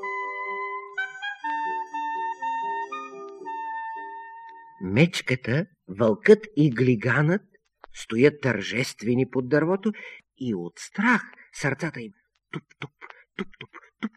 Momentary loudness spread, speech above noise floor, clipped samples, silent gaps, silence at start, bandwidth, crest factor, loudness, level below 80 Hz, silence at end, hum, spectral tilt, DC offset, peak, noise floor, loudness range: 19 LU; 21 dB; under 0.1%; none; 0 s; 13 kHz; 24 dB; -25 LUFS; -64 dBFS; 0.1 s; none; -6.5 dB/octave; under 0.1%; -2 dBFS; -44 dBFS; 8 LU